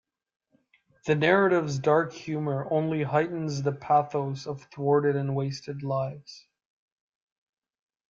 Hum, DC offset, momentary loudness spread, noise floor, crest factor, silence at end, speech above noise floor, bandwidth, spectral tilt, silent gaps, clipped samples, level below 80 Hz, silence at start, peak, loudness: none; under 0.1%; 13 LU; -67 dBFS; 22 dB; 1.7 s; 41 dB; 7.6 kHz; -7 dB/octave; none; under 0.1%; -68 dBFS; 1.05 s; -6 dBFS; -27 LUFS